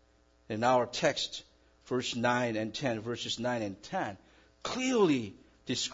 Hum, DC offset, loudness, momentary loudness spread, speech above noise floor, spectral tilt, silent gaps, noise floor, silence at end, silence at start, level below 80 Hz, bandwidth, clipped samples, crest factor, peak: none; under 0.1%; -32 LUFS; 12 LU; 33 dB; -4 dB/octave; none; -64 dBFS; 0 s; 0.5 s; -66 dBFS; 7.8 kHz; under 0.1%; 18 dB; -14 dBFS